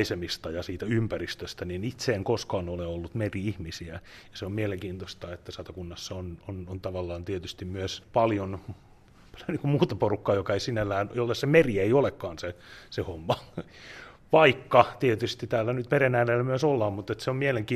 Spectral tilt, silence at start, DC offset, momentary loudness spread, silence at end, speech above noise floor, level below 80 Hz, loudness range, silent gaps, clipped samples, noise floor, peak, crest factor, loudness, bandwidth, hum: -6 dB/octave; 0 s; under 0.1%; 18 LU; 0 s; 24 dB; -56 dBFS; 11 LU; none; under 0.1%; -52 dBFS; -4 dBFS; 24 dB; -28 LUFS; 14 kHz; none